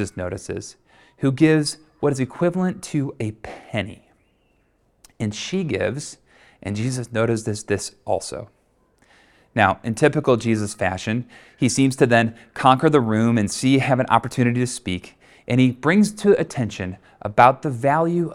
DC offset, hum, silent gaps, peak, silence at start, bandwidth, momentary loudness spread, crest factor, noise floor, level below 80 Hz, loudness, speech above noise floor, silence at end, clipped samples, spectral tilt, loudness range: under 0.1%; none; none; 0 dBFS; 0 s; 14.5 kHz; 14 LU; 22 dB; -63 dBFS; -54 dBFS; -21 LUFS; 43 dB; 0 s; under 0.1%; -5.5 dB/octave; 9 LU